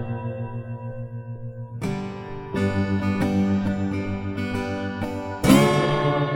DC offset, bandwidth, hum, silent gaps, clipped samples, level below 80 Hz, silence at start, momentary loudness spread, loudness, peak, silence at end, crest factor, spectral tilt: under 0.1%; over 20 kHz; none; none; under 0.1%; -46 dBFS; 0 s; 17 LU; -24 LUFS; -2 dBFS; 0 s; 22 dB; -6.5 dB/octave